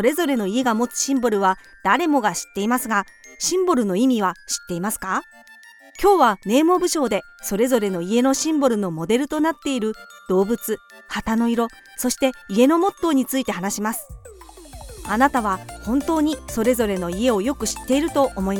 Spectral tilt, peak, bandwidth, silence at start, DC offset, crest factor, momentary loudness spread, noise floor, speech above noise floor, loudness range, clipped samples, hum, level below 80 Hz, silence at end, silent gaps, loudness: -4 dB/octave; -4 dBFS; 18 kHz; 0 s; under 0.1%; 18 dB; 9 LU; -46 dBFS; 25 dB; 3 LU; under 0.1%; none; -46 dBFS; 0 s; none; -21 LUFS